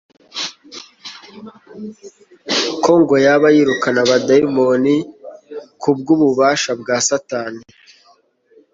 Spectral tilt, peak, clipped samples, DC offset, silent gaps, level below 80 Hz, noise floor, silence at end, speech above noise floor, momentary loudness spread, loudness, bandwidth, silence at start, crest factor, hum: -4 dB/octave; -2 dBFS; under 0.1%; under 0.1%; none; -58 dBFS; -54 dBFS; 1.1 s; 40 dB; 22 LU; -15 LUFS; 8 kHz; 0.35 s; 16 dB; none